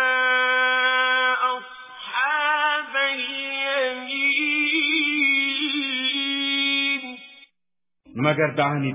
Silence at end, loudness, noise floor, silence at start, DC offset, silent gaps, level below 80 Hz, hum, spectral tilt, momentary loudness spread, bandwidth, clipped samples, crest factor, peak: 0 s; -21 LUFS; -87 dBFS; 0 s; under 0.1%; none; -72 dBFS; none; -1 dB/octave; 7 LU; 3.9 kHz; under 0.1%; 18 dB; -4 dBFS